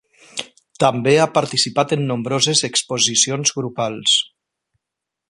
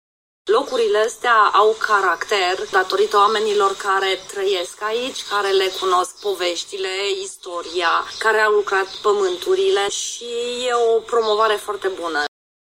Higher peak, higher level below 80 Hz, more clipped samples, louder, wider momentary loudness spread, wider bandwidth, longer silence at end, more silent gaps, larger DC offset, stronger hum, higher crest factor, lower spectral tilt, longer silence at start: about the same, 0 dBFS vs -2 dBFS; about the same, -62 dBFS vs -62 dBFS; neither; about the same, -17 LUFS vs -19 LUFS; first, 14 LU vs 9 LU; second, 11.5 kHz vs 16 kHz; first, 1.05 s vs 0.55 s; neither; neither; neither; about the same, 20 dB vs 16 dB; first, -2.5 dB/octave vs -1 dB/octave; about the same, 0.35 s vs 0.45 s